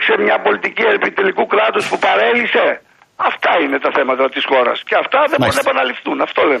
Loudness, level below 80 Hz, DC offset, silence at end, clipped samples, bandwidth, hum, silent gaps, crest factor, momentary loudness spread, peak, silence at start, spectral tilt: -14 LUFS; -56 dBFS; under 0.1%; 0 s; under 0.1%; 14 kHz; none; none; 12 dB; 5 LU; -2 dBFS; 0 s; -4 dB/octave